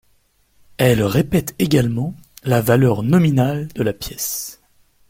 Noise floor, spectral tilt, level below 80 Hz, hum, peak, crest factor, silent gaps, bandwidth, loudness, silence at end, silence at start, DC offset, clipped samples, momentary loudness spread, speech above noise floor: -59 dBFS; -6 dB/octave; -44 dBFS; none; -2 dBFS; 16 dB; none; 16.5 kHz; -18 LUFS; 0.55 s; 0.8 s; under 0.1%; under 0.1%; 10 LU; 42 dB